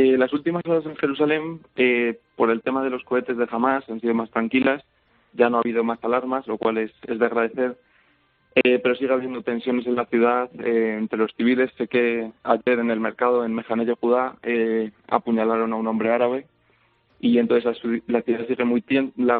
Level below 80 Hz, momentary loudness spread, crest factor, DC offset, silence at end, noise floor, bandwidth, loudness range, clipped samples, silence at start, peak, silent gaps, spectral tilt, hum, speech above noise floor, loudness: -68 dBFS; 6 LU; 20 dB; under 0.1%; 0 s; -63 dBFS; 4.5 kHz; 2 LU; under 0.1%; 0 s; -2 dBFS; none; -4 dB/octave; none; 41 dB; -22 LUFS